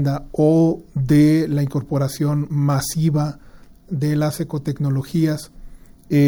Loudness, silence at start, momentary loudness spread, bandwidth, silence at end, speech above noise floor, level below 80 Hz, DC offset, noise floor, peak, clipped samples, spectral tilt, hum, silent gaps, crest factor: -19 LUFS; 0 s; 10 LU; over 20 kHz; 0 s; 20 dB; -44 dBFS; under 0.1%; -39 dBFS; -4 dBFS; under 0.1%; -7.5 dB/octave; none; none; 14 dB